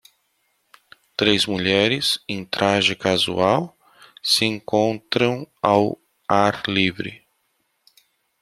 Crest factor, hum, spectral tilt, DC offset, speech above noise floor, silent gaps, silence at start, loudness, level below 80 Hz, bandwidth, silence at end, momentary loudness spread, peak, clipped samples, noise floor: 20 dB; none; -4 dB/octave; under 0.1%; 50 dB; none; 1.2 s; -20 LUFS; -60 dBFS; 15 kHz; 1.25 s; 9 LU; -2 dBFS; under 0.1%; -70 dBFS